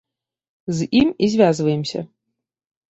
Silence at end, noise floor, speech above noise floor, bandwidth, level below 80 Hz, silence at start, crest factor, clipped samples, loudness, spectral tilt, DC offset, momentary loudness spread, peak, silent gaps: 0.85 s; -80 dBFS; 62 dB; 8.2 kHz; -54 dBFS; 0.65 s; 18 dB; under 0.1%; -19 LUFS; -6 dB/octave; under 0.1%; 16 LU; -4 dBFS; none